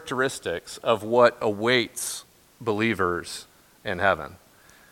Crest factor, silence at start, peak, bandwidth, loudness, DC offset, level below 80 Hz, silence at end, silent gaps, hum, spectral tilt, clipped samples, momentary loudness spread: 22 dB; 0 s; -4 dBFS; 17 kHz; -25 LUFS; under 0.1%; -58 dBFS; 0.55 s; none; none; -4 dB/octave; under 0.1%; 17 LU